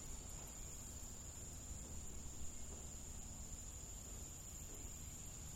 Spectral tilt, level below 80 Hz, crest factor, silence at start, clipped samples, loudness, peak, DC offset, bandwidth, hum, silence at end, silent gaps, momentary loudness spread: -3 dB/octave; -56 dBFS; 14 dB; 0 s; under 0.1%; -51 LUFS; -36 dBFS; under 0.1%; 16 kHz; none; 0 s; none; 1 LU